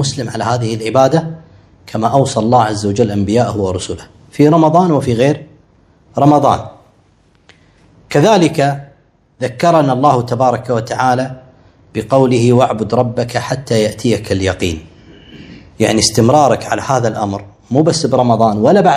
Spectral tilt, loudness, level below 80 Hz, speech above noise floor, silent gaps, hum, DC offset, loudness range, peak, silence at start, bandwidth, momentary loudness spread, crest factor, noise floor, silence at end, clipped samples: -6 dB/octave; -13 LUFS; -44 dBFS; 39 dB; none; none; under 0.1%; 3 LU; 0 dBFS; 0 s; 14 kHz; 13 LU; 14 dB; -51 dBFS; 0 s; 0.3%